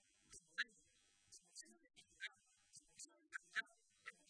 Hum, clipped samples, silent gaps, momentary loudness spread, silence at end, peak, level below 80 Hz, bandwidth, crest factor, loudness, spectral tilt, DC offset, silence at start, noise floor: none; under 0.1%; none; 18 LU; 0.15 s; -28 dBFS; -90 dBFS; 11 kHz; 28 dB; -52 LUFS; 1 dB/octave; under 0.1%; 0.3 s; -77 dBFS